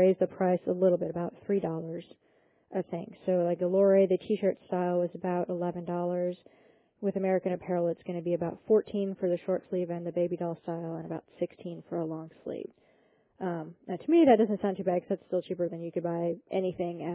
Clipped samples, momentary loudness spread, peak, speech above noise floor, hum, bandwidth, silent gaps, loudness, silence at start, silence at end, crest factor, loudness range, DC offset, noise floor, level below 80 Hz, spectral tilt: under 0.1%; 13 LU; -10 dBFS; 37 dB; none; 4 kHz; none; -30 LUFS; 0 s; 0 s; 20 dB; 7 LU; under 0.1%; -67 dBFS; -72 dBFS; -11.5 dB/octave